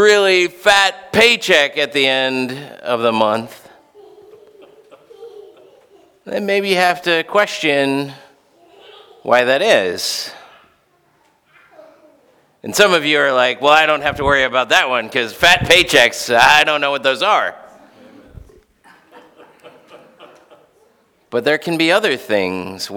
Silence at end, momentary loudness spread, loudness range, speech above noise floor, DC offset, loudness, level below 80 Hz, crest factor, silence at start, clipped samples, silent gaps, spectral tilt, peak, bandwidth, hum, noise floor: 0 s; 13 LU; 11 LU; 43 dB; under 0.1%; -14 LUFS; -48 dBFS; 18 dB; 0 s; under 0.1%; none; -2.5 dB/octave; 0 dBFS; over 20 kHz; none; -58 dBFS